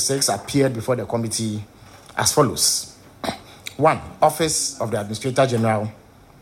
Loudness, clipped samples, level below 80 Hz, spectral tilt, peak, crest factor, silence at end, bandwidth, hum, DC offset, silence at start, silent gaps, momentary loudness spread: -21 LUFS; under 0.1%; -52 dBFS; -3.5 dB/octave; -4 dBFS; 18 dB; 0.45 s; 16.5 kHz; none; under 0.1%; 0 s; none; 13 LU